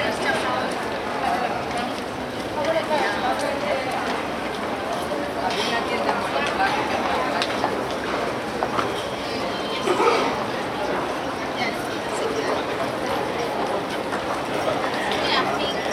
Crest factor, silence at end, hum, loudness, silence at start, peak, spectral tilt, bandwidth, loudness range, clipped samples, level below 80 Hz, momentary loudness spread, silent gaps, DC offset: 20 dB; 0 s; none; -24 LUFS; 0 s; -4 dBFS; -4 dB/octave; 17 kHz; 2 LU; under 0.1%; -50 dBFS; 5 LU; none; under 0.1%